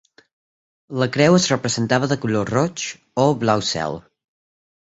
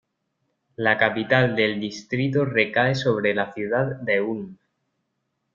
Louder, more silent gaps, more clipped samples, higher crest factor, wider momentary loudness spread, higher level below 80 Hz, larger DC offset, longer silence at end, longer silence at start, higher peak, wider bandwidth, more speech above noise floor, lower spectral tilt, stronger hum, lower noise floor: first, -19 LUFS vs -22 LUFS; neither; neither; about the same, 20 dB vs 22 dB; first, 12 LU vs 9 LU; first, -54 dBFS vs -62 dBFS; neither; second, 0.85 s vs 1 s; about the same, 0.9 s vs 0.8 s; about the same, -2 dBFS vs -2 dBFS; first, 8.2 kHz vs 7.4 kHz; first, over 71 dB vs 54 dB; second, -5 dB/octave vs -6.5 dB/octave; neither; first, under -90 dBFS vs -76 dBFS